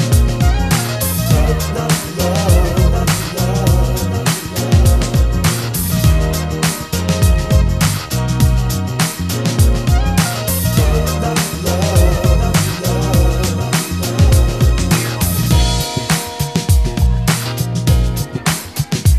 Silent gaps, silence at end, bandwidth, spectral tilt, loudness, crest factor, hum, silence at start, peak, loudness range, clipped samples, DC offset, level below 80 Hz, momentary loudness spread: none; 0 s; 14 kHz; -5 dB/octave; -15 LUFS; 12 dB; none; 0 s; 0 dBFS; 1 LU; under 0.1%; 0.3%; -18 dBFS; 5 LU